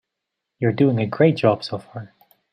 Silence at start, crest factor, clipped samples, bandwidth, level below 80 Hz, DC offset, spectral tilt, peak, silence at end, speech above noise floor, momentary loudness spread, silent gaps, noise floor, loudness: 0.6 s; 18 dB; under 0.1%; 14.5 kHz; -62 dBFS; under 0.1%; -8.5 dB/octave; -4 dBFS; 0.45 s; 62 dB; 17 LU; none; -81 dBFS; -20 LUFS